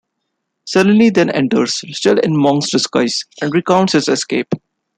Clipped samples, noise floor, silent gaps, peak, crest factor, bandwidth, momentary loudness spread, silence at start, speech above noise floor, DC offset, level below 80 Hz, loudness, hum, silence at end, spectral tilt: under 0.1%; -73 dBFS; none; -2 dBFS; 14 dB; 10.5 kHz; 8 LU; 0.65 s; 59 dB; under 0.1%; -58 dBFS; -14 LUFS; none; 0.4 s; -4.5 dB/octave